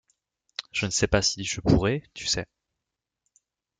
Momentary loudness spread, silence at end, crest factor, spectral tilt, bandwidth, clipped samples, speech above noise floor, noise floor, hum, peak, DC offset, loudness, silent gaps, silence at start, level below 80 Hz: 14 LU; 1.35 s; 22 dB; -4 dB/octave; 10 kHz; under 0.1%; 61 dB; -86 dBFS; none; -6 dBFS; under 0.1%; -25 LUFS; none; 0.6 s; -44 dBFS